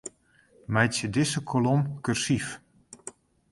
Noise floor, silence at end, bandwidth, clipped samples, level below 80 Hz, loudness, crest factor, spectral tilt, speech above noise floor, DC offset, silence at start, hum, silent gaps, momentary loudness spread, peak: -61 dBFS; 0.4 s; 11.5 kHz; under 0.1%; -58 dBFS; -27 LUFS; 22 dB; -5 dB/octave; 36 dB; under 0.1%; 0.05 s; none; none; 19 LU; -6 dBFS